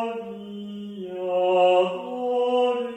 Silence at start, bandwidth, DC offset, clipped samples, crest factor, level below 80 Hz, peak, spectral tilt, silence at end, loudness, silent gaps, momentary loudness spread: 0 s; 8.6 kHz; under 0.1%; under 0.1%; 14 dB; -74 dBFS; -10 dBFS; -6 dB/octave; 0 s; -23 LUFS; none; 17 LU